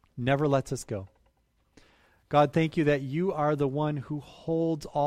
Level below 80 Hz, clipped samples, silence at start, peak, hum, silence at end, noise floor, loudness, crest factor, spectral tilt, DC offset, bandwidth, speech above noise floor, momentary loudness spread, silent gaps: -56 dBFS; under 0.1%; 0.15 s; -10 dBFS; none; 0 s; -70 dBFS; -28 LUFS; 18 dB; -7 dB/octave; under 0.1%; 14 kHz; 43 dB; 11 LU; none